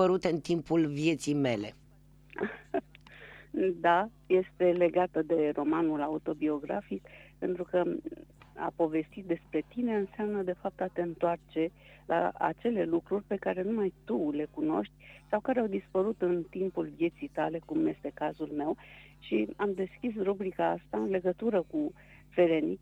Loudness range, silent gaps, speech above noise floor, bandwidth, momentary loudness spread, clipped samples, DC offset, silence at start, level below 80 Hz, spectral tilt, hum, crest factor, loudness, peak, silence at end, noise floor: 5 LU; none; 28 dB; 11 kHz; 10 LU; under 0.1%; under 0.1%; 0 s; -62 dBFS; -7 dB/octave; none; 18 dB; -32 LUFS; -12 dBFS; 0.05 s; -59 dBFS